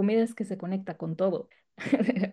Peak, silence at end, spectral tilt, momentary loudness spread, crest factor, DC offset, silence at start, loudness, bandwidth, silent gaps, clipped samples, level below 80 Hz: -10 dBFS; 0 s; -7.5 dB/octave; 11 LU; 18 dB; under 0.1%; 0 s; -30 LUFS; 12 kHz; none; under 0.1%; -74 dBFS